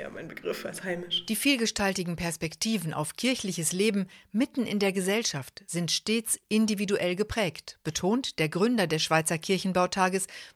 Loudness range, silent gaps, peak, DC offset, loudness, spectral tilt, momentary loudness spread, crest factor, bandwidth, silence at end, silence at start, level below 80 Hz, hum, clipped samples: 2 LU; none; -8 dBFS; under 0.1%; -28 LUFS; -3.5 dB/octave; 9 LU; 20 dB; 16 kHz; 0.05 s; 0 s; -58 dBFS; none; under 0.1%